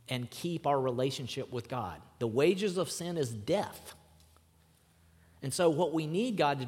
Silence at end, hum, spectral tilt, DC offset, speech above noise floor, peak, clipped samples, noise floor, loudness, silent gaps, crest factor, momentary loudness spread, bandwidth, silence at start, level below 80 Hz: 0 s; none; -5 dB/octave; under 0.1%; 33 dB; -14 dBFS; under 0.1%; -65 dBFS; -33 LUFS; none; 20 dB; 10 LU; 16.5 kHz; 0.1 s; -70 dBFS